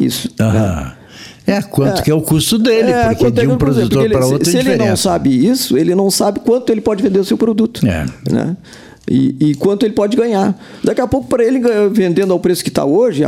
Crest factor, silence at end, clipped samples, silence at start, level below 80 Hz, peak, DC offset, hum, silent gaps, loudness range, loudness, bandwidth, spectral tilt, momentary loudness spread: 12 dB; 0 s; under 0.1%; 0 s; -38 dBFS; 0 dBFS; under 0.1%; none; none; 3 LU; -13 LUFS; 16.5 kHz; -5.5 dB/octave; 5 LU